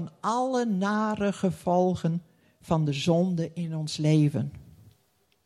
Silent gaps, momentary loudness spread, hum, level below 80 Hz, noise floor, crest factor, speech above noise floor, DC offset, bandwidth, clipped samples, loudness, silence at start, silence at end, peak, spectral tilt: none; 8 LU; none; -60 dBFS; -69 dBFS; 18 dB; 43 dB; under 0.1%; 12 kHz; under 0.1%; -27 LUFS; 0 s; 0.85 s; -10 dBFS; -7 dB/octave